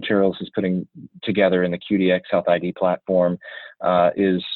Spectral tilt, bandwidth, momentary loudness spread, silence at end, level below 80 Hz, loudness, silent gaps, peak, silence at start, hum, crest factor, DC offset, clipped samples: -10 dB/octave; 4.4 kHz; 9 LU; 0 s; -60 dBFS; -21 LUFS; none; -4 dBFS; 0 s; none; 16 dB; under 0.1%; under 0.1%